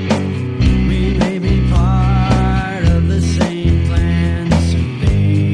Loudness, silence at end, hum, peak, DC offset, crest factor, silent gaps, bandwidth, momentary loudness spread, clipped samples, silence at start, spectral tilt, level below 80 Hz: -15 LUFS; 0 s; none; -2 dBFS; under 0.1%; 12 dB; none; 10.5 kHz; 3 LU; under 0.1%; 0 s; -7 dB/octave; -20 dBFS